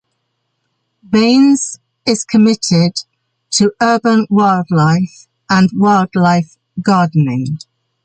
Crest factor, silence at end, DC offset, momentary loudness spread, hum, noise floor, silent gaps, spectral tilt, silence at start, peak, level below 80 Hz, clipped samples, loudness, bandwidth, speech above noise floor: 12 dB; 0.45 s; under 0.1%; 10 LU; none; -69 dBFS; none; -5.5 dB/octave; 1.1 s; -2 dBFS; -54 dBFS; under 0.1%; -13 LUFS; 9.4 kHz; 57 dB